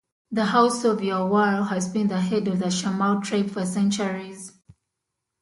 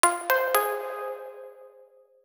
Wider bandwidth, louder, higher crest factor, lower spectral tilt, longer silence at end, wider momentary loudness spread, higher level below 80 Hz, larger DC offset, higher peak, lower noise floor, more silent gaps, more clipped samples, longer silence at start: second, 11.5 kHz vs over 20 kHz; first, -23 LUFS vs -26 LUFS; second, 18 dB vs 28 dB; first, -5.5 dB/octave vs 3 dB/octave; first, 0.9 s vs 0.55 s; second, 10 LU vs 22 LU; first, -66 dBFS vs under -90 dBFS; neither; second, -6 dBFS vs 0 dBFS; first, -82 dBFS vs -56 dBFS; neither; neither; first, 0.3 s vs 0.05 s